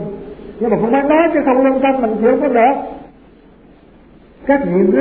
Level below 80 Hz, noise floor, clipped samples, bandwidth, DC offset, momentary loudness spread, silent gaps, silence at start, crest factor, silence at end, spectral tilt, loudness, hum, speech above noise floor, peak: -46 dBFS; -44 dBFS; under 0.1%; 4.1 kHz; 0.1%; 16 LU; none; 0 s; 14 dB; 0 s; -11.5 dB/octave; -14 LUFS; none; 31 dB; 0 dBFS